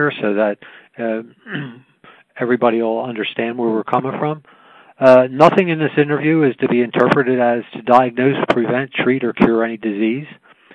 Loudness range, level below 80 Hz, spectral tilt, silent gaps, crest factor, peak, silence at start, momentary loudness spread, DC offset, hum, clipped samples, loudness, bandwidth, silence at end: 7 LU; -56 dBFS; -8 dB/octave; none; 16 dB; 0 dBFS; 0 s; 14 LU; under 0.1%; none; under 0.1%; -16 LUFS; 9.8 kHz; 0.4 s